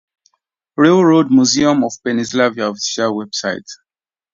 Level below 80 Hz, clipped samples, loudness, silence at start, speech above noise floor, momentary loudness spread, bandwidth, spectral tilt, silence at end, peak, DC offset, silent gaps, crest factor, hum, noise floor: -56 dBFS; under 0.1%; -14 LUFS; 0.8 s; 48 dB; 10 LU; 7.8 kHz; -4.5 dB/octave; 0.6 s; 0 dBFS; under 0.1%; none; 16 dB; none; -62 dBFS